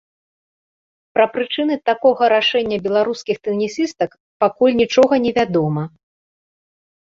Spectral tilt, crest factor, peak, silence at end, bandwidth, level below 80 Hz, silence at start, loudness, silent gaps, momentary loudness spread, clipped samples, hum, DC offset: -5.5 dB/octave; 16 dB; -2 dBFS; 1.25 s; 7.6 kHz; -58 dBFS; 1.15 s; -17 LUFS; 4.20-4.40 s; 9 LU; under 0.1%; none; under 0.1%